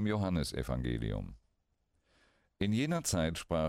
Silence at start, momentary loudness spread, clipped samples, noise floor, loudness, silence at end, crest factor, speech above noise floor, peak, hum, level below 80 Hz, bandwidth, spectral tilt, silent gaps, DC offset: 0 s; 7 LU; under 0.1%; -78 dBFS; -35 LUFS; 0 s; 16 dB; 44 dB; -20 dBFS; none; -48 dBFS; 16 kHz; -5.5 dB/octave; none; under 0.1%